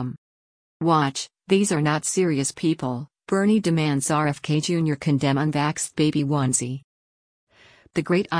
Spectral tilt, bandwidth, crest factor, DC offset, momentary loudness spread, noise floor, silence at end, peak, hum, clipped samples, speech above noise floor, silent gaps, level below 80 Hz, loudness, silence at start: -5 dB/octave; 10.5 kHz; 16 dB; under 0.1%; 9 LU; under -90 dBFS; 0 s; -6 dBFS; none; under 0.1%; over 68 dB; 0.18-0.80 s, 6.84-7.47 s; -60 dBFS; -23 LUFS; 0 s